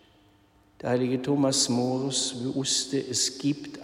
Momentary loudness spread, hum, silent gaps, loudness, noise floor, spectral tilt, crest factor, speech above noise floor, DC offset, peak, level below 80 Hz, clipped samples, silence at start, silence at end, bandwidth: 7 LU; none; none; -26 LUFS; -61 dBFS; -3.5 dB/octave; 16 dB; 34 dB; under 0.1%; -10 dBFS; -66 dBFS; under 0.1%; 0.85 s; 0 s; 14.5 kHz